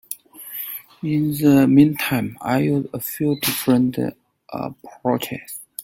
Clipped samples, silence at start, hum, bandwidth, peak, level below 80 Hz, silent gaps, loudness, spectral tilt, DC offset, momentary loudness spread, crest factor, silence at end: under 0.1%; 0.1 s; none; 17 kHz; -2 dBFS; -56 dBFS; none; -20 LUFS; -6 dB/octave; under 0.1%; 17 LU; 18 dB; 0 s